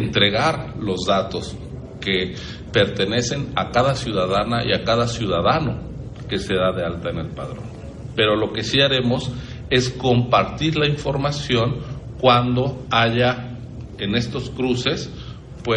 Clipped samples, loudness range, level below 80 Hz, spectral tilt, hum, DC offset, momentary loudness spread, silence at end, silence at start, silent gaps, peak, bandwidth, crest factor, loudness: under 0.1%; 3 LU; -40 dBFS; -5.5 dB/octave; none; under 0.1%; 16 LU; 0 s; 0 s; none; -2 dBFS; 10.5 kHz; 18 dB; -20 LUFS